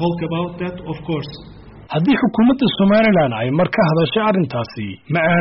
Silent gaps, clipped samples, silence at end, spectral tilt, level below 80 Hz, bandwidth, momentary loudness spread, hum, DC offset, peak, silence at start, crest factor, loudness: none; under 0.1%; 0 s; -5.5 dB/octave; -46 dBFS; 5.8 kHz; 13 LU; none; under 0.1%; -4 dBFS; 0 s; 12 dB; -17 LUFS